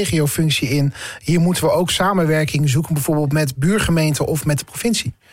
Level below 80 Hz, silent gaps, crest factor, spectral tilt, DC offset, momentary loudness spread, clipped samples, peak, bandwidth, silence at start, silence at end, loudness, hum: -40 dBFS; none; 8 dB; -5 dB/octave; under 0.1%; 4 LU; under 0.1%; -8 dBFS; 16.5 kHz; 0 s; 0.2 s; -18 LUFS; none